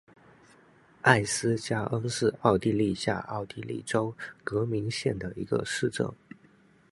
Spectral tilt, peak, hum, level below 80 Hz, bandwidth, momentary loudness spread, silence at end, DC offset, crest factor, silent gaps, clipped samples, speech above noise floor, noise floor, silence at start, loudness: -5 dB/octave; -2 dBFS; none; -58 dBFS; 11.5 kHz; 11 LU; 0.75 s; under 0.1%; 26 dB; none; under 0.1%; 32 dB; -60 dBFS; 1.05 s; -29 LUFS